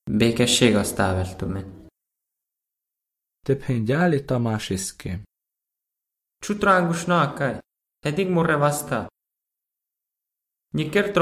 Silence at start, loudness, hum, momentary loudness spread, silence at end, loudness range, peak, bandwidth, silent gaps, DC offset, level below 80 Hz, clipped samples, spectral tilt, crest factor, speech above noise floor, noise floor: 0.05 s; -22 LUFS; none; 15 LU; 0 s; 4 LU; -4 dBFS; 15.5 kHz; none; under 0.1%; -46 dBFS; under 0.1%; -5 dB/octave; 22 dB; 64 dB; -86 dBFS